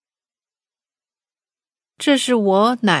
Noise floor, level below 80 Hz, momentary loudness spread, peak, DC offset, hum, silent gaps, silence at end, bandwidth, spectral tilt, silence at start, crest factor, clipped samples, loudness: under -90 dBFS; -78 dBFS; 3 LU; 0 dBFS; under 0.1%; none; none; 0 s; 11 kHz; -4.5 dB/octave; 2 s; 20 dB; under 0.1%; -17 LUFS